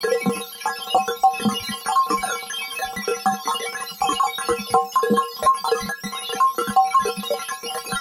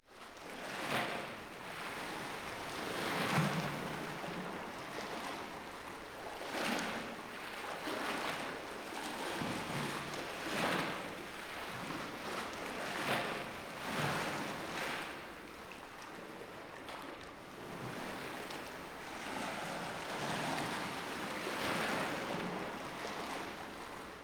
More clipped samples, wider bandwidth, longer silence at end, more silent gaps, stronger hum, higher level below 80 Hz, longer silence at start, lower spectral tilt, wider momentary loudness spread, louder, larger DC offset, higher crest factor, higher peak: neither; second, 16.5 kHz vs over 20 kHz; about the same, 0 s vs 0 s; neither; neither; first, -56 dBFS vs -68 dBFS; about the same, 0 s vs 0.05 s; about the same, -3 dB/octave vs -4 dB/octave; second, 8 LU vs 11 LU; first, -22 LUFS vs -40 LUFS; neither; about the same, 18 dB vs 20 dB; first, -4 dBFS vs -20 dBFS